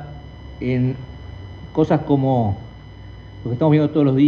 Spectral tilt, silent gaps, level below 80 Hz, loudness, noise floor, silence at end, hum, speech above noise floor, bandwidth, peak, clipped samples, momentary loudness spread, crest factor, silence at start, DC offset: -10 dB/octave; none; -42 dBFS; -19 LUFS; -38 dBFS; 0 s; none; 21 dB; 6.6 kHz; -4 dBFS; under 0.1%; 22 LU; 16 dB; 0 s; under 0.1%